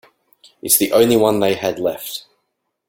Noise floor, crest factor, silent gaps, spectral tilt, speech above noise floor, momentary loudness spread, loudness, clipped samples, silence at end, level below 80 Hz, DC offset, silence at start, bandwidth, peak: -73 dBFS; 18 dB; none; -3.5 dB/octave; 57 dB; 16 LU; -16 LUFS; under 0.1%; 0.7 s; -54 dBFS; under 0.1%; 0.65 s; 17 kHz; 0 dBFS